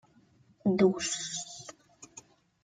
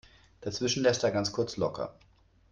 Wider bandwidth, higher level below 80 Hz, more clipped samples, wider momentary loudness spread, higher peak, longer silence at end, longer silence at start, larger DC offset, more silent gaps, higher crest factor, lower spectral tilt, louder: about the same, 9.4 kHz vs 9.4 kHz; second, -70 dBFS vs -62 dBFS; neither; first, 24 LU vs 13 LU; about the same, -12 dBFS vs -12 dBFS; second, 0.45 s vs 0.6 s; first, 0.65 s vs 0.4 s; neither; neither; about the same, 22 dB vs 18 dB; about the same, -4.5 dB/octave vs -4 dB/octave; about the same, -30 LUFS vs -30 LUFS